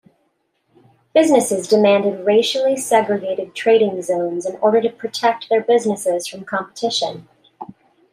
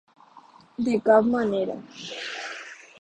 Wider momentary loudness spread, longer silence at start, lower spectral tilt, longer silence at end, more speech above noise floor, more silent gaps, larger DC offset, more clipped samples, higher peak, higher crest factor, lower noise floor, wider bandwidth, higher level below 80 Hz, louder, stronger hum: second, 11 LU vs 19 LU; first, 1.15 s vs 0.8 s; second, -4 dB/octave vs -5.5 dB/octave; first, 0.45 s vs 0.25 s; first, 50 dB vs 29 dB; neither; neither; neither; first, -2 dBFS vs -6 dBFS; about the same, 16 dB vs 20 dB; first, -67 dBFS vs -52 dBFS; first, 15.5 kHz vs 9 kHz; second, -70 dBFS vs -64 dBFS; first, -18 LUFS vs -24 LUFS; neither